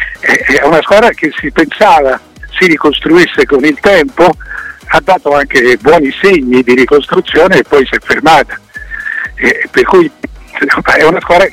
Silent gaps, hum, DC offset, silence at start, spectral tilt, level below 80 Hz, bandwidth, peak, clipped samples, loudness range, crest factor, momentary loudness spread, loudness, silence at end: none; none; under 0.1%; 0 s; -4.5 dB/octave; -34 dBFS; 16 kHz; 0 dBFS; 0.3%; 2 LU; 8 dB; 11 LU; -8 LUFS; 0 s